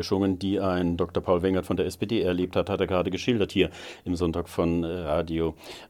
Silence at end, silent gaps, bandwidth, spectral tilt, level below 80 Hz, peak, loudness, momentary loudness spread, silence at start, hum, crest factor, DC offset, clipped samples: 0.05 s; none; 16.5 kHz; -6.5 dB/octave; -48 dBFS; -6 dBFS; -27 LUFS; 4 LU; 0 s; none; 20 dB; under 0.1%; under 0.1%